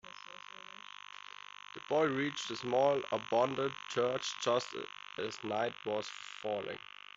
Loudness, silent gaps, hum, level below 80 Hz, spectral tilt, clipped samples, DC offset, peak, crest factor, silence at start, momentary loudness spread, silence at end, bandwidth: -35 LUFS; none; 50 Hz at -70 dBFS; -78 dBFS; -4 dB/octave; under 0.1%; under 0.1%; -16 dBFS; 20 dB; 0.05 s; 18 LU; 0.4 s; 7.8 kHz